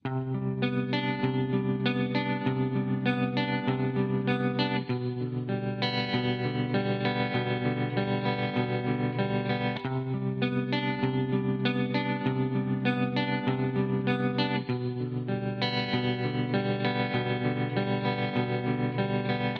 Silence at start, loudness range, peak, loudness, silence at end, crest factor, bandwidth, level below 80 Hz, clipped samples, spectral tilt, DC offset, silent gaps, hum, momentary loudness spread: 0.05 s; 1 LU; -12 dBFS; -29 LUFS; 0 s; 16 dB; 6 kHz; -62 dBFS; under 0.1%; -8.5 dB/octave; under 0.1%; none; none; 4 LU